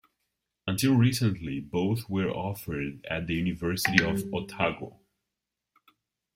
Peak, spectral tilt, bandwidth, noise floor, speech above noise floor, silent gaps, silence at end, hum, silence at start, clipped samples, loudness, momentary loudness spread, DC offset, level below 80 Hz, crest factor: -2 dBFS; -5.5 dB/octave; 16 kHz; -86 dBFS; 59 dB; none; 1.45 s; none; 0.65 s; under 0.1%; -28 LUFS; 11 LU; under 0.1%; -56 dBFS; 28 dB